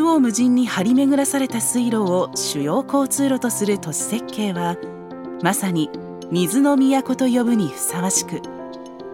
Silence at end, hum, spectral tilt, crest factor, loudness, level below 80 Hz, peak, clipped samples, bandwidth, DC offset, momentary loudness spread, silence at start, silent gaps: 0 s; none; -4.5 dB/octave; 18 dB; -19 LUFS; -64 dBFS; -2 dBFS; under 0.1%; 17 kHz; under 0.1%; 14 LU; 0 s; none